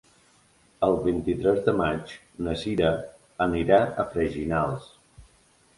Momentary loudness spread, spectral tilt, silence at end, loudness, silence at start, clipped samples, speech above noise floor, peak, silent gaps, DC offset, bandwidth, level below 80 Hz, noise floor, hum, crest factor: 12 LU; -7 dB/octave; 0.55 s; -25 LUFS; 0.8 s; under 0.1%; 36 dB; -6 dBFS; none; under 0.1%; 11.5 kHz; -46 dBFS; -61 dBFS; none; 20 dB